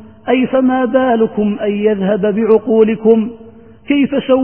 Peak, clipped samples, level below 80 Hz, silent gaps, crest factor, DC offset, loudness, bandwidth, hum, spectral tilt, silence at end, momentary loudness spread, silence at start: 0 dBFS; under 0.1%; -50 dBFS; none; 12 dB; 0.4%; -13 LUFS; 3.3 kHz; none; -12.5 dB/octave; 0 s; 5 LU; 0 s